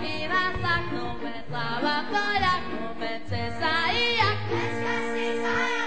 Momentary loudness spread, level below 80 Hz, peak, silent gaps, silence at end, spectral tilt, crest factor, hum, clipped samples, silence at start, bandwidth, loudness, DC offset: 10 LU; -48 dBFS; -10 dBFS; none; 0 s; -4.5 dB/octave; 16 dB; none; under 0.1%; 0 s; 8 kHz; -26 LUFS; 2%